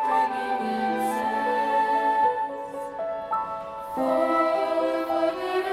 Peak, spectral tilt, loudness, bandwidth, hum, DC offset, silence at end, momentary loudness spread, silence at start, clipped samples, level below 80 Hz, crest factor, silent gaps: -12 dBFS; -4.5 dB/octave; -25 LUFS; 15.5 kHz; none; under 0.1%; 0 s; 9 LU; 0 s; under 0.1%; -62 dBFS; 14 dB; none